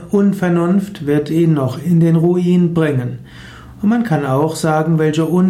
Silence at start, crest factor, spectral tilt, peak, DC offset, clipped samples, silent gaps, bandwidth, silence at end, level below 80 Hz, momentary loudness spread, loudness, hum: 0 s; 10 dB; -8 dB/octave; -4 dBFS; under 0.1%; under 0.1%; none; 13.5 kHz; 0 s; -48 dBFS; 5 LU; -15 LUFS; none